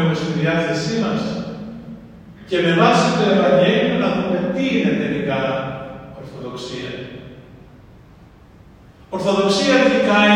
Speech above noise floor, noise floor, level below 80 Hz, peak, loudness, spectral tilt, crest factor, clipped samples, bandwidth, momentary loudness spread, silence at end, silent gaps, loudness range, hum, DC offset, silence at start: 28 dB; -45 dBFS; -50 dBFS; -2 dBFS; -18 LUFS; -5.5 dB/octave; 18 dB; under 0.1%; 10.5 kHz; 19 LU; 0 s; none; 14 LU; none; under 0.1%; 0 s